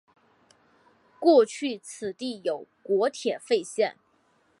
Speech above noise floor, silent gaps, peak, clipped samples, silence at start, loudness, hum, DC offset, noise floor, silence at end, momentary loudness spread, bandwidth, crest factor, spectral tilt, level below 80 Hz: 41 dB; none; -8 dBFS; under 0.1%; 1.2 s; -26 LUFS; none; under 0.1%; -66 dBFS; 0.7 s; 14 LU; 11.5 kHz; 20 dB; -4 dB/octave; -80 dBFS